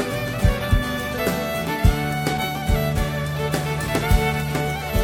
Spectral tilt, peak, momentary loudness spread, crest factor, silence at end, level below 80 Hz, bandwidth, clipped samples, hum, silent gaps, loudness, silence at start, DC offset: -5.5 dB/octave; -4 dBFS; 4 LU; 18 dB; 0 s; -26 dBFS; 19 kHz; under 0.1%; none; none; -22 LUFS; 0 s; under 0.1%